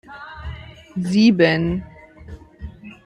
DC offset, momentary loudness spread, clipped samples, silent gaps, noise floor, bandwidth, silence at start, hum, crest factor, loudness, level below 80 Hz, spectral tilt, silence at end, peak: under 0.1%; 26 LU; under 0.1%; none; -40 dBFS; 10.5 kHz; 0.1 s; none; 18 dB; -18 LUFS; -42 dBFS; -6.5 dB/octave; 0.1 s; -2 dBFS